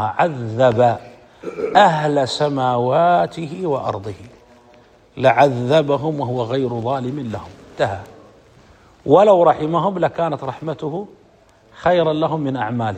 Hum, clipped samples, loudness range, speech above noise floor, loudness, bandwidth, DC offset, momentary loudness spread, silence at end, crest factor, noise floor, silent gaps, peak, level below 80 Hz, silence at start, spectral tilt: none; under 0.1%; 4 LU; 34 dB; -18 LUFS; 9.4 kHz; under 0.1%; 16 LU; 0 s; 18 dB; -51 dBFS; none; 0 dBFS; -56 dBFS; 0 s; -6.5 dB/octave